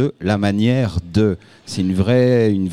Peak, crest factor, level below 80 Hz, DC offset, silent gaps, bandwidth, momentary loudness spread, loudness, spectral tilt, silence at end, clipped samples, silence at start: -4 dBFS; 14 dB; -40 dBFS; 0.6%; none; 11.5 kHz; 8 LU; -17 LUFS; -7.5 dB/octave; 0 s; under 0.1%; 0 s